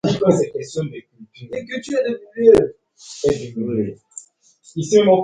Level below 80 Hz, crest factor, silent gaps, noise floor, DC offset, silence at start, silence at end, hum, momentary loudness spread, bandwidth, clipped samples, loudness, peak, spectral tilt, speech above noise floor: -50 dBFS; 18 dB; none; -52 dBFS; under 0.1%; 0.05 s; 0 s; none; 23 LU; 9.8 kHz; under 0.1%; -19 LUFS; 0 dBFS; -6 dB/octave; 34 dB